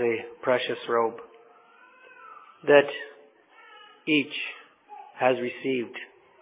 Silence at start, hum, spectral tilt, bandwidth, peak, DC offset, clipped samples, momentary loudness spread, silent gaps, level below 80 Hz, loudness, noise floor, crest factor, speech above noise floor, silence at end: 0 s; none; -8.5 dB/octave; 4 kHz; -4 dBFS; under 0.1%; under 0.1%; 26 LU; none; -82 dBFS; -26 LUFS; -55 dBFS; 24 dB; 30 dB; 0.35 s